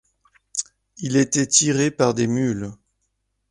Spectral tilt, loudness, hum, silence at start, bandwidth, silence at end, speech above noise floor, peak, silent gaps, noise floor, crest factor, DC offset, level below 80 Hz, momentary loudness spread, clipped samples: -4 dB/octave; -20 LUFS; none; 0.55 s; 11.5 kHz; 0.75 s; 53 dB; -2 dBFS; none; -73 dBFS; 20 dB; under 0.1%; -56 dBFS; 15 LU; under 0.1%